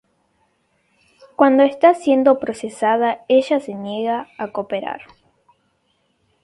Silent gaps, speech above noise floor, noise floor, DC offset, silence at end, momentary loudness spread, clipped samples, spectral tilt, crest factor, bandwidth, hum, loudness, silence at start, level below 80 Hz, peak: none; 49 dB; -66 dBFS; under 0.1%; 1.45 s; 14 LU; under 0.1%; -5.5 dB/octave; 18 dB; 11.5 kHz; none; -18 LUFS; 1.4 s; -66 dBFS; 0 dBFS